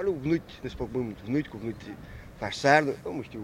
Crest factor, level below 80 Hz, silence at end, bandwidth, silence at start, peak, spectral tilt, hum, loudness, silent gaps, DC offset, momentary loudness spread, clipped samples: 24 dB; -52 dBFS; 0 s; 16 kHz; 0 s; -6 dBFS; -5.5 dB/octave; none; -29 LUFS; none; under 0.1%; 19 LU; under 0.1%